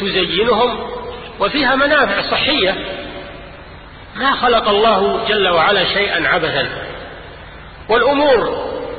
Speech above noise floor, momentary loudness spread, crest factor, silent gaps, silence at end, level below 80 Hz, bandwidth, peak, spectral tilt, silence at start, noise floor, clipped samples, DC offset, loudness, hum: 21 dB; 20 LU; 14 dB; none; 0 s; -40 dBFS; 4.8 kHz; -2 dBFS; -9.5 dB/octave; 0 s; -36 dBFS; under 0.1%; under 0.1%; -14 LUFS; none